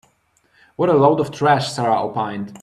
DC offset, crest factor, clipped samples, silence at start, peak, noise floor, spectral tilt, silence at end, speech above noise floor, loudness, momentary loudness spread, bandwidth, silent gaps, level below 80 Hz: under 0.1%; 18 dB; under 0.1%; 0.8 s; -2 dBFS; -61 dBFS; -6 dB/octave; 0.05 s; 44 dB; -18 LUFS; 9 LU; 12.5 kHz; none; -58 dBFS